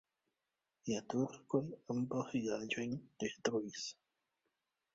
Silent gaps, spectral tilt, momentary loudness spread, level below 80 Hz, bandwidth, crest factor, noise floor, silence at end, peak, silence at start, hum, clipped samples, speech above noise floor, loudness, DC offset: none; -5 dB/octave; 6 LU; -78 dBFS; 7.6 kHz; 24 dB; -90 dBFS; 1.05 s; -18 dBFS; 0.85 s; none; under 0.1%; 50 dB; -40 LUFS; under 0.1%